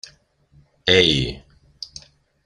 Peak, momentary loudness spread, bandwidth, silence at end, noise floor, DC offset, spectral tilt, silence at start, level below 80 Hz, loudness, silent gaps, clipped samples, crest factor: 0 dBFS; 25 LU; 10.5 kHz; 1.05 s; -56 dBFS; under 0.1%; -4 dB/octave; 0.85 s; -44 dBFS; -17 LUFS; none; under 0.1%; 22 dB